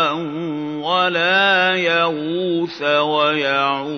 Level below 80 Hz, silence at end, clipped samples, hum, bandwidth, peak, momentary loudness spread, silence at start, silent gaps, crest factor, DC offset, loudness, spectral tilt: -76 dBFS; 0 s; under 0.1%; none; 6.6 kHz; -2 dBFS; 10 LU; 0 s; none; 16 dB; under 0.1%; -17 LUFS; -5 dB/octave